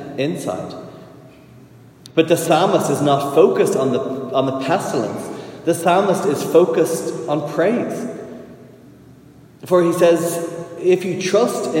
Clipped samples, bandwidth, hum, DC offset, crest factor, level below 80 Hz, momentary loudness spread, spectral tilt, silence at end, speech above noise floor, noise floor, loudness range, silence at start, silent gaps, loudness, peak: under 0.1%; 16.5 kHz; none; under 0.1%; 18 dB; -64 dBFS; 14 LU; -5.5 dB/octave; 0 s; 28 dB; -45 dBFS; 3 LU; 0 s; none; -18 LUFS; 0 dBFS